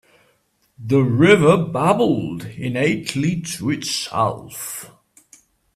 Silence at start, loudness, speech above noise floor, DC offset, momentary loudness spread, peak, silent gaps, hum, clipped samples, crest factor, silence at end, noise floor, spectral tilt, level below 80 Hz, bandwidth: 0.8 s; -19 LUFS; 45 dB; under 0.1%; 16 LU; 0 dBFS; none; none; under 0.1%; 20 dB; 0.9 s; -63 dBFS; -5.5 dB/octave; -54 dBFS; 15.5 kHz